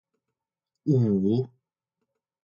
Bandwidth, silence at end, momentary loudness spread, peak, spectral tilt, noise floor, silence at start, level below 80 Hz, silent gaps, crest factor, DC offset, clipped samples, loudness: 7 kHz; 0.95 s; 12 LU; -12 dBFS; -11 dB/octave; -87 dBFS; 0.85 s; -64 dBFS; none; 18 dB; under 0.1%; under 0.1%; -25 LUFS